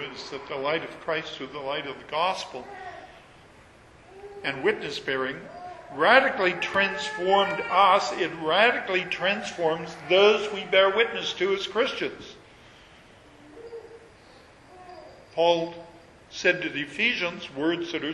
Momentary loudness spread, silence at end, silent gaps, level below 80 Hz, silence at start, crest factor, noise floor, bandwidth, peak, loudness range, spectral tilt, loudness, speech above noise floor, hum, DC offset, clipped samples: 21 LU; 0 s; none; -62 dBFS; 0 s; 24 dB; -52 dBFS; 11.5 kHz; -2 dBFS; 10 LU; -3.5 dB/octave; -25 LUFS; 27 dB; none; under 0.1%; under 0.1%